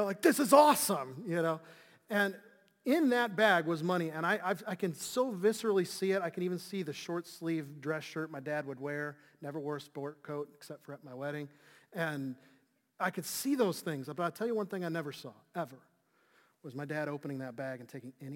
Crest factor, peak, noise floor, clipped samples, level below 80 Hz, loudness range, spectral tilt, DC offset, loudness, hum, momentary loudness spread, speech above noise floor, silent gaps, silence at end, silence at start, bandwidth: 24 dB; -10 dBFS; -71 dBFS; under 0.1%; -84 dBFS; 11 LU; -4.5 dB/octave; under 0.1%; -34 LUFS; none; 16 LU; 37 dB; none; 0 s; 0 s; 17 kHz